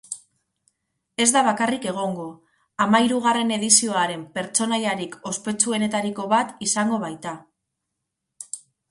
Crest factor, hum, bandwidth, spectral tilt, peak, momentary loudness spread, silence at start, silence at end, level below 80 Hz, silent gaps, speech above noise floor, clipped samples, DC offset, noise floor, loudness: 22 dB; none; 11.5 kHz; -2.5 dB/octave; -2 dBFS; 19 LU; 0.1 s; 0.35 s; -68 dBFS; none; 59 dB; under 0.1%; under 0.1%; -81 dBFS; -21 LUFS